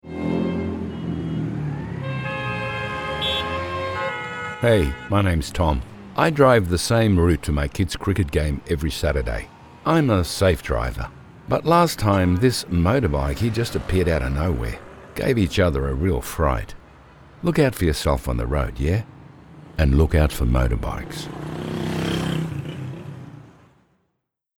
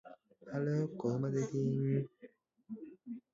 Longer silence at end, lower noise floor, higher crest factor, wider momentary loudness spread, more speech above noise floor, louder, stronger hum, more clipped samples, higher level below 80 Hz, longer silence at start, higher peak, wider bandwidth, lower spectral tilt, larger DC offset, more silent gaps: first, 1.1 s vs 0.15 s; first, -77 dBFS vs -61 dBFS; first, 20 dB vs 14 dB; about the same, 13 LU vs 15 LU; first, 57 dB vs 26 dB; first, -22 LUFS vs -36 LUFS; neither; neither; first, -30 dBFS vs -76 dBFS; about the same, 0.05 s vs 0.05 s; first, -2 dBFS vs -24 dBFS; first, 19 kHz vs 7.4 kHz; second, -6 dB/octave vs -10 dB/octave; neither; neither